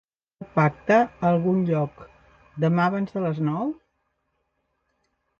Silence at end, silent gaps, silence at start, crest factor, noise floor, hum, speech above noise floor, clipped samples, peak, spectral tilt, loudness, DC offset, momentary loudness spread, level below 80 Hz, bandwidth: 1.65 s; none; 0.4 s; 18 dB; -74 dBFS; none; 52 dB; under 0.1%; -8 dBFS; -9 dB/octave; -23 LUFS; under 0.1%; 11 LU; -60 dBFS; 7 kHz